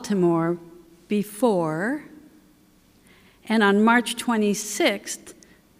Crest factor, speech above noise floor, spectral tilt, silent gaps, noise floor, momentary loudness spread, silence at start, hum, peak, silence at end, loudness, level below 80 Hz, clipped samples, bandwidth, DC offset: 16 dB; 35 dB; -4.5 dB/octave; none; -57 dBFS; 13 LU; 0 s; none; -8 dBFS; 0.45 s; -23 LUFS; -66 dBFS; under 0.1%; 16 kHz; under 0.1%